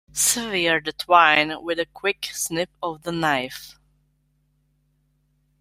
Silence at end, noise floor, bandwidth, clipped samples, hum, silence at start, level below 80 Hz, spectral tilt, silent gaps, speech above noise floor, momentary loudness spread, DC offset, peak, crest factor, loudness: 1.9 s; -67 dBFS; 16 kHz; under 0.1%; none; 0.15 s; -60 dBFS; -2 dB/octave; none; 45 dB; 13 LU; under 0.1%; -2 dBFS; 22 dB; -21 LUFS